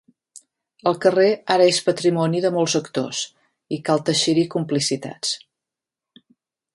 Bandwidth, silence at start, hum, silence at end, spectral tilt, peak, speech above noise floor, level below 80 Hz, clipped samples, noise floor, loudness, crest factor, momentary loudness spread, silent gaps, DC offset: 11.5 kHz; 0.85 s; none; 1.4 s; -4 dB/octave; -2 dBFS; 67 dB; -68 dBFS; under 0.1%; -87 dBFS; -20 LUFS; 20 dB; 10 LU; none; under 0.1%